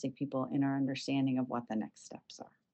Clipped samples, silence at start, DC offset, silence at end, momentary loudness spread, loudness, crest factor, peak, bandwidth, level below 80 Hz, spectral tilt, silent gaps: under 0.1%; 0 s; under 0.1%; 0.3 s; 18 LU; -35 LUFS; 14 dB; -22 dBFS; 8.4 kHz; -82 dBFS; -6.5 dB/octave; none